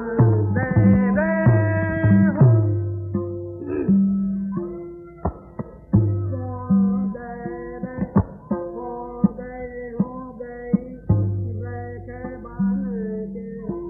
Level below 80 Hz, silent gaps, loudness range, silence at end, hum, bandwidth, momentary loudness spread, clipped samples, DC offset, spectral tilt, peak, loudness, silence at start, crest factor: -42 dBFS; none; 8 LU; 0 s; none; 2.7 kHz; 16 LU; under 0.1%; under 0.1%; -14 dB/octave; -4 dBFS; -22 LUFS; 0 s; 18 dB